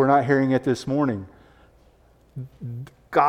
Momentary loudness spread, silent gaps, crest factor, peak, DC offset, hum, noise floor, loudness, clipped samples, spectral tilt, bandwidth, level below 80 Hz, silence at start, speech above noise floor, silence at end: 20 LU; none; 20 dB; -4 dBFS; under 0.1%; none; -56 dBFS; -22 LUFS; under 0.1%; -7.5 dB/octave; 11 kHz; -58 dBFS; 0 s; 34 dB; 0 s